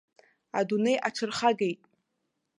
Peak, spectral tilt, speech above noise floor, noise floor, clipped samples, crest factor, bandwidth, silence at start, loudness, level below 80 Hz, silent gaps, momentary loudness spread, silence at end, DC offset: -8 dBFS; -4.5 dB/octave; 53 dB; -80 dBFS; under 0.1%; 22 dB; 11.5 kHz; 0.55 s; -28 LUFS; -76 dBFS; none; 8 LU; 0.85 s; under 0.1%